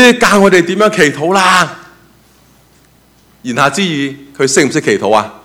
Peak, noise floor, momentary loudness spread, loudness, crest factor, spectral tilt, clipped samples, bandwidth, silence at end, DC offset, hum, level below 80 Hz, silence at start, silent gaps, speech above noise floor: 0 dBFS; -48 dBFS; 10 LU; -10 LUFS; 12 dB; -3.5 dB/octave; 0.8%; 17 kHz; 0.1 s; under 0.1%; none; -48 dBFS; 0 s; none; 37 dB